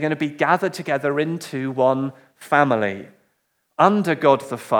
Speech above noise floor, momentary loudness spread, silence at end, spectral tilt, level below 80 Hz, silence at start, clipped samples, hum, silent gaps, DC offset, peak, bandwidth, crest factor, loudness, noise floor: 50 dB; 9 LU; 0 s; -6 dB/octave; -78 dBFS; 0 s; under 0.1%; none; none; under 0.1%; 0 dBFS; 19 kHz; 20 dB; -20 LUFS; -70 dBFS